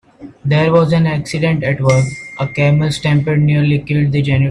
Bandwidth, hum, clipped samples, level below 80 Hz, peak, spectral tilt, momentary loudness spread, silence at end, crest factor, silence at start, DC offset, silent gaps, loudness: 11 kHz; none; under 0.1%; -42 dBFS; 0 dBFS; -7 dB/octave; 5 LU; 0 s; 14 dB; 0.2 s; under 0.1%; none; -14 LUFS